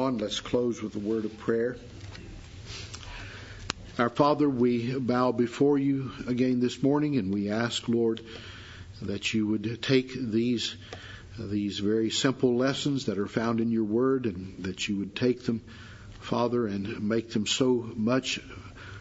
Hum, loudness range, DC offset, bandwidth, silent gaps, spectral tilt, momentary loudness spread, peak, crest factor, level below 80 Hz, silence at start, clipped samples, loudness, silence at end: none; 4 LU; under 0.1%; 8 kHz; none; -5.5 dB/octave; 18 LU; -4 dBFS; 24 dB; -54 dBFS; 0 s; under 0.1%; -28 LUFS; 0 s